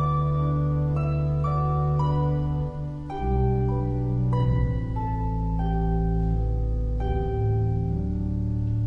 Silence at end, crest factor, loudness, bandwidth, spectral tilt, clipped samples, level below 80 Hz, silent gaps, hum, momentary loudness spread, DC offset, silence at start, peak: 0 s; 12 dB; -26 LUFS; 5.2 kHz; -10.5 dB/octave; under 0.1%; -30 dBFS; none; none; 4 LU; under 0.1%; 0 s; -12 dBFS